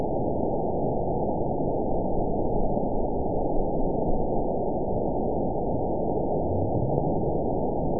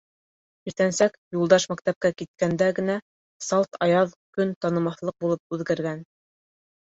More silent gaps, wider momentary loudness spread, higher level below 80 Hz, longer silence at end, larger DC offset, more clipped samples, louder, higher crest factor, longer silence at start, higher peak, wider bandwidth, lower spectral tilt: second, none vs 1.18-1.31 s, 1.96-2.01 s, 2.28-2.34 s, 3.02-3.40 s, 4.16-4.33 s, 4.56-4.61 s, 5.39-5.50 s; second, 1 LU vs 10 LU; first, -34 dBFS vs -64 dBFS; second, 0 s vs 0.85 s; first, 3% vs under 0.1%; neither; second, -27 LUFS vs -24 LUFS; about the same, 18 dB vs 22 dB; second, 0 s vs 0.65 s; second, -8 dBFS vs -4 dBFS; second, 1 kHz vs 8 kHz; first, -18.5 dB/octave vs -5 dB/octave